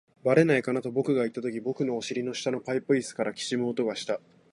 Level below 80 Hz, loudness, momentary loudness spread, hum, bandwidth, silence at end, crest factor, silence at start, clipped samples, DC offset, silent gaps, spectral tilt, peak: -72 dBFS; -28 LUFS; 9 LU; none; 11.5 kHz; 0.35 s; 20 dB; 0.25 s; under 0.1%; under 0.1%; none; -5.5 dB/octave; -8 dBFS